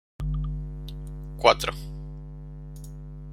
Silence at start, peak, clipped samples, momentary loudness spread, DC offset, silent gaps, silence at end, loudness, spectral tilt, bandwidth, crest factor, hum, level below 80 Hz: 0.2 s; -2 dBFS; under 0.1%; 21 LU; under 0.1%; none; 0 s; -27 LUFS; -4.5 dB/octave; 16 kHz; 26 dB; 50 Hz at -35 dBFS; -36 dBFS